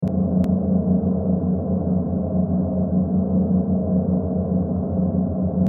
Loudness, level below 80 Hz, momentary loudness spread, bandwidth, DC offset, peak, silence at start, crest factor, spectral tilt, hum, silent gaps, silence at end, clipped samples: -21 LUFS; -38 dBFS; 3 LU; 1.6 kHz; under 0.1%; -8 dBFS; 0 s; 12 dB; -13.5 dB/octave; 60 Hz at -35 dBFS; none; 0 s; under 0.1%